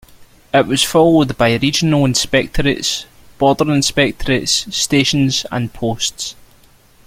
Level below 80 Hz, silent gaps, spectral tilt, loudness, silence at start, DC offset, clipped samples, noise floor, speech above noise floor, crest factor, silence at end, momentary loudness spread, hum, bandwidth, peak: -36 dBFS; none; -4 dB/octave; -15 LUFS; 0.2 s; under 0.1%; under 0.1%; -48 dBFS; 33 dB; 16 dB; 0.75 s; 8 LU; none; 16.5 kHz; 0 dBFS